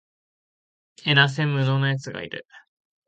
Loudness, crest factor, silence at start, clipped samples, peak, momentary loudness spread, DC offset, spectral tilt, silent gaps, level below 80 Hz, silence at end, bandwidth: -22 LUFS; 22 dB; 1.05 s; under 0.1%; -4 dBFS; 16 LU; under 0.1%; -5.5 dB/octave; none; -66 dBFS; 0.5 s; 8 kHz